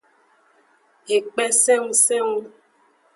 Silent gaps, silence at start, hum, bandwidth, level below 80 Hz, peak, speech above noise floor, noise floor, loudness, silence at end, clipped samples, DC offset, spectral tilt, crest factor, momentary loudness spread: none; 1.1 s; none; 12 kHz; -80 dBFS; -4 dBFS; 40 dB; -60 dBFS; -18 LUFS; 0.7 s; under 0.1%; under 0.1%; 0 dB/octave; 20 dB; 9 LU